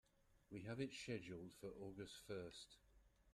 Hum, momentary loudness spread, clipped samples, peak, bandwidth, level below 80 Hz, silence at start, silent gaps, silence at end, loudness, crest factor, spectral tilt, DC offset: none; 9 LU; under 0.1%; -34 dBFS; 13.5 kHz; -76 dBFS; 0.3 s; none; 0 s; -53 LUFS; 22 dB; -5 dB/octave; under 0.1%